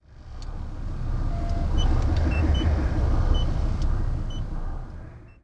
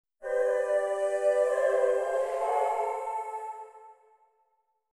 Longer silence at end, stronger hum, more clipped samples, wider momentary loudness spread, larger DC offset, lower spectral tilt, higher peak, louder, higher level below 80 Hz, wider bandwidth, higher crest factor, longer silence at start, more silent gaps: second, 0.1 s vs 1.05 s; neither; neither; first, 16 LU vs 12 LU; neither; first, -7 dB/octave vs -1.5 dB/octave; first, -8 dBFS vs -14 dBFS; about the same, -27 LUFS vs -28 LUFS; first, -26 dBFS vs -76 dBFS; second, 7.2 kHz vs 12.5 kHz; about the same, 14 dB vs 14 dB; about the same, 0.1 s vs 0.2 s; neither